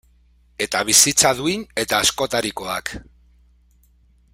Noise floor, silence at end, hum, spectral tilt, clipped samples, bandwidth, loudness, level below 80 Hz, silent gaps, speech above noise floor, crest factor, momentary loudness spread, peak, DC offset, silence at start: -56 dBFS; 1.3 s; none; -1 dB/octave; under 0.1%; 16 kHz; -18 LUFS; -50 dBFS; none; 36 dB; 22 dB; 15 LU; 0 dBFS; under 0.1%; 0.6 s